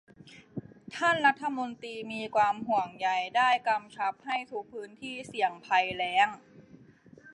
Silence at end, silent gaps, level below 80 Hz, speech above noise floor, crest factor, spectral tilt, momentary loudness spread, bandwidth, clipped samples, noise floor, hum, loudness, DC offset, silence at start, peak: 0 s; none; -72 dBFS; 26 dB; 20 dB; -3.5 dB/octave; 18 LU; 11 kHz; under 0.1%; -56 dBFS; none; -29 LUFS; under 0.1%; 0.25 s; -10 dBFS